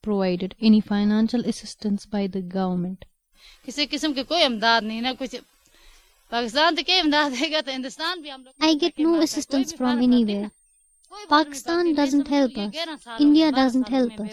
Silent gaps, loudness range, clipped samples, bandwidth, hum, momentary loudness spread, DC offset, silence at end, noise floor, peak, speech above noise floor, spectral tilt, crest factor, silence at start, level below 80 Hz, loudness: none; 3 LU; under 0.1%; 13.5 kHz; none; 12 LU; under 0.1%; 0 s; -61 dBFS; -4 dBFS; 38 dB; -4.5 dB/octave; 18 dB; 0.05 s; -56 dBFS; -22 LUFS